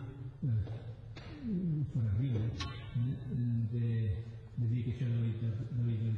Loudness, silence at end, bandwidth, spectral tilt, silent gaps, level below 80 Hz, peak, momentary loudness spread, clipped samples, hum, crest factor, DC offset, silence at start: -36 LUFS; 0 s; 6.4 kHz; -8.5 dB/octave; none; -54 dBFS; -24 dBFS; 10 LU; under 0.1%; none; 12 dB; under 0.1%; 0 s